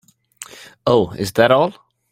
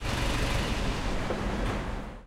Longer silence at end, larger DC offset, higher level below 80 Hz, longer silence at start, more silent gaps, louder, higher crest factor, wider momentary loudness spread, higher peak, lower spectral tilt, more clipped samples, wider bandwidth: first, 0.4 s vs 0 s; neither; second, -52 dBFS vs -34 dBFS; first, 0.4 s vs 0 s; neither; first, -17 LUFS vs -31 LUFS; about the same, 18 dB vs 14 dB; first, 22 LU vs 4 LU; first, 0 dBFS vs -16 dBFS; about the same, -5.5 dB/octave vs -5 dB/octave; neither; about the same, 16.5 kHz vs 15.5 kHz